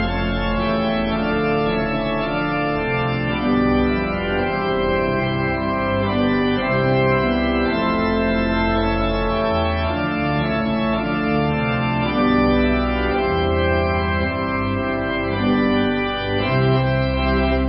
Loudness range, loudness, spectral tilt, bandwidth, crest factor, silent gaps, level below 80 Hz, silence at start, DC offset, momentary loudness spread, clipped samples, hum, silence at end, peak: 1 LU; -20 LUFS; -11.5 dB/octave; 5.6 kHz; 12 dB; none; -30 dBFS; 0 s; under 0.1%; 4 LU; under 0.1%; none; 0 s; -6 dBFS